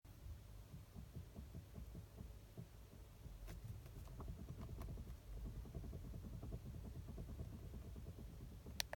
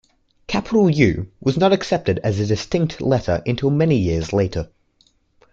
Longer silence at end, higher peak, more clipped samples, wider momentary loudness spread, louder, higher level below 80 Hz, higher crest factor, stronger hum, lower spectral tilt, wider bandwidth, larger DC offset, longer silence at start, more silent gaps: second, 0.05 s vs 0.85 s; second, -18 dBFS vs -2 dBFS; neither; about the same, 6 LU vs 7 LU; second, -55 LUFS vs -19 LUFS; second, -56 dBFS vs -42 dBFS; first, 36 dB vs 18 dB; neither; second, -5 dB/octave vs -7 dB/octave; first, 17.5 kHz vs 7.8 kHz; neither; second, 0.05 s vs 0.5 s; neither